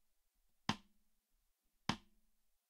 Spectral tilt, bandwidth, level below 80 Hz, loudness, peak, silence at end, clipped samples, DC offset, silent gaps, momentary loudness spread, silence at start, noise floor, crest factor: -4 dB/octave; 15.5 kHz; -72 dBFS; -45 LUFS; -20 dBFS; 0.7 s; under 0.1%; under 0.1%; none; 6 LU; 0.7 s; -81 dBFS; 30 dB